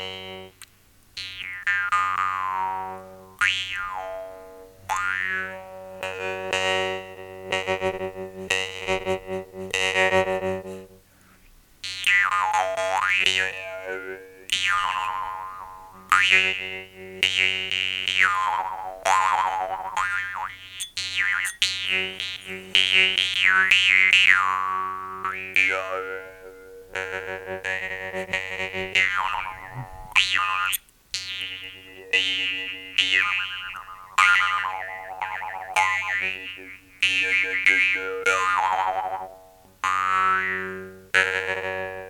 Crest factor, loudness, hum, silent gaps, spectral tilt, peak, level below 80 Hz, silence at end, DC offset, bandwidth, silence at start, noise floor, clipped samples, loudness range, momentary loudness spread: 24 dB; -22 LUFS; none; none; -1 dB/octave; 0 dBFS; -58 dBFS; 0 s; under 0.1%; 19 kHz; 0 s; -56 dBFS; under 0.1%; 9 LU; 18 LU